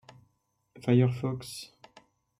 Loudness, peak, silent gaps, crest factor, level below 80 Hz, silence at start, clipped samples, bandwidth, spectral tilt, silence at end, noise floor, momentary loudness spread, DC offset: -28 LUFS; -12 dBFS; none; 20 dB; -68 dBFS; 0.85 s; under 0.1%; 14.5 kHz; -7.5 dB/octave; 0.75 s; -74 dBFS; 18 LU; under 0.1%